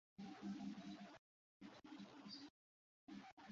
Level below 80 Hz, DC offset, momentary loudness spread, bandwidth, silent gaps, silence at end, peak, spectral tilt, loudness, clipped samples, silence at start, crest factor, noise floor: -88 dBFS; under 0.1%; 12 LU; 7.4 kHz; 1.19-1.60 s, 2.50-3.07 s, 3.32-3.37 s; 0 s; -40 dBFS; -4.5 dB/octave; -57 LUFS; under 0.1%; 0.2 s; 16 dB; under -90 dBFS